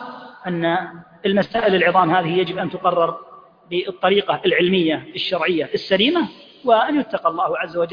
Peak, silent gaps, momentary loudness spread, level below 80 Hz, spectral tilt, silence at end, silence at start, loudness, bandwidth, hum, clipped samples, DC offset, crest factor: -2 dBFS; none; 10 LU; -60 dBFS; -7.5 dB/octave; 0 s; 0 s; -19 LUFS; 5.2 kHz; none; under 0.1%; under 0.1%; 18 dB